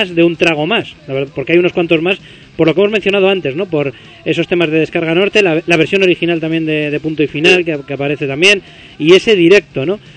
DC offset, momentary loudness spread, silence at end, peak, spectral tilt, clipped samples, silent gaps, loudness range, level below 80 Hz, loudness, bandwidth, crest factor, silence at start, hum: under 0.1%; 9 LU; 0.05 s; 0 dBFS; -5.5 dB/octave; 0.3%; none; 3 LU; -50 dBFS; -12 LUFS; 11 kHz; 12 dB; 0 s; none